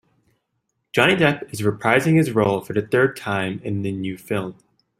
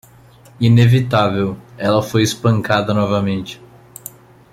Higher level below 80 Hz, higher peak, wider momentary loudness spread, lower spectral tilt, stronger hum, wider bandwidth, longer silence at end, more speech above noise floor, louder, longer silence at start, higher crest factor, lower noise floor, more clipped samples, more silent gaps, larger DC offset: second, -58 dBFS vs -48 dBFS; about the same, -2 dBFS vs -2 dBFS; second, 10 LU vs 22 LU; about the same, -6 dB/octave vs -6.5 dB/octave; neither; first, 16 kHz vs 14.5 kHz; second, 0.45 s vs 0.95 s; first, 54 dB vs 30 dB; second, -20 LUFS vs -16 LUFS; first, 0.95 s vs 0.6 s; about the same, 20 dB vs 16 dB; first, -74 dBFS vs -45 dBFS; neither; neither; neither